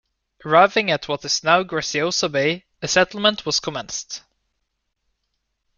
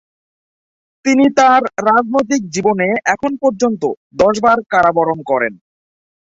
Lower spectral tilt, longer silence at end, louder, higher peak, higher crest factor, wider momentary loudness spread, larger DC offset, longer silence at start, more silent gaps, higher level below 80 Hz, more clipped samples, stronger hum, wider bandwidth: second, -2.5 dB/octave vs -5 dB/octave; first, 1.6 s vs 0.85 s; second, -20 LUFS vs -14 LUFS; about the same, -2 dBFS vs 0 dBFS; first, 20 dB vs 14 dB; first, 13 LU vs 7 LU; neither; second, 0.45 s vs 1.05 s; second, none vs 3.97-4.10 s; second, -58 dBFS vs -52 dBFS; neither; neither; first, 10 kHz vs 8 kHz